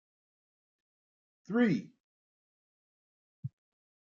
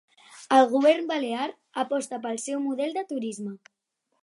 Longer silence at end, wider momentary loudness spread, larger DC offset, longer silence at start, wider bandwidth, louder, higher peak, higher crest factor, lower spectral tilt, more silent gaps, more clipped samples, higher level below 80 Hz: about the same, 0.7 s vs 0.65 s; first, 18 LU vs 12 LU; neither; first, 1.5 s vs 0.3 s; second, 7 kHz vs 11.5 kHz; second, -31 LUFS vs -26 LUFS; second, -18 dBFS vs -6 dBFS; about the same, 22 dB vs 20 dB; first, -6.5 dB/octave vs -3.5 dB/octave; first, 2.00-3.43 s vs none; neither; about the same, -82 dBFS vs -84 dBFS